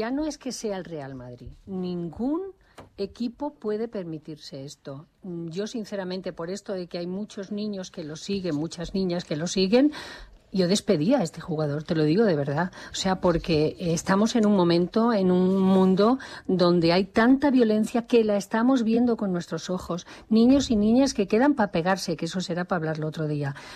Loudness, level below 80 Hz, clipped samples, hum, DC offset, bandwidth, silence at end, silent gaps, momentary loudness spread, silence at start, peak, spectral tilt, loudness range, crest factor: -25 LUFS; -52 dBFS; under 0.1%; none; under 0.1%; 13 kHz; 0 s; none; 16 LU; 0 s; -10 dBFS; -6 dB/octave; 12 LU; 14 dB